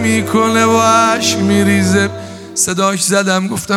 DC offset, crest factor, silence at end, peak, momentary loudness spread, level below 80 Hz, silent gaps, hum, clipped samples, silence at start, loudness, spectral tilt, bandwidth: under 0.1%; 12 dB; 0 s; 0 dBFS; 6 LU; -54 dBFS; none; none; under 0.1%; 0 s; -12 LUFS; -4 dB/octave; 16.5 kHz